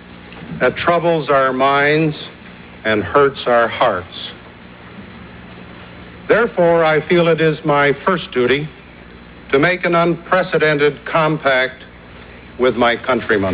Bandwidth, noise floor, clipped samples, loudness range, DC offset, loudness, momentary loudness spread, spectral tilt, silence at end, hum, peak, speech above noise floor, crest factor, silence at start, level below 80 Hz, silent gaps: 4 kHz; -38 dBFS; under 0.1%; 4 LU; under 0.1%; -15 LUFS; 22 LU; -9.5 dB/octave; 0 s; none; -2 dBFS; 23 dB; 16 dB; 0.1 s; -46 dBFS; none